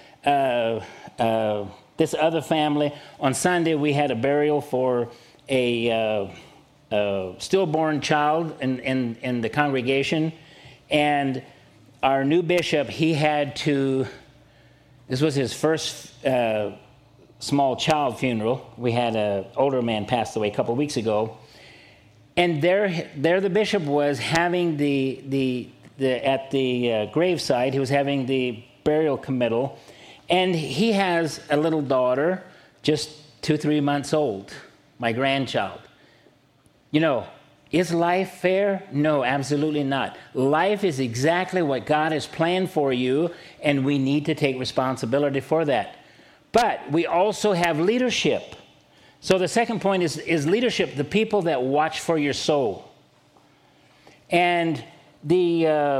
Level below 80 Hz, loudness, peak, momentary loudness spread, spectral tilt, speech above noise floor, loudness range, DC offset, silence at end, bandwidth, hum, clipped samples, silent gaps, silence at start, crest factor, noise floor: -60 dBFS; -23 LUFS; -4 dBFS; 7 LU; -5.5 dB/octave; 37 dB; 3 LU; under 0.1%; 0 s; 15.5 kHz; none; under 0.1%; none; 0.25 s; 20 dB; -59 dBFS